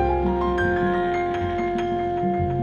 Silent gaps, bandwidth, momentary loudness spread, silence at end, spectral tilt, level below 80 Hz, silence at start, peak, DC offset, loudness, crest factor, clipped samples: none; 7 kHz; 3 LU; 0 s; -8 dB/octave; -36 dBFS; 0 s; -10 dBFS; under 0.1%; -23 LUFS; 12 dB; under 0.1%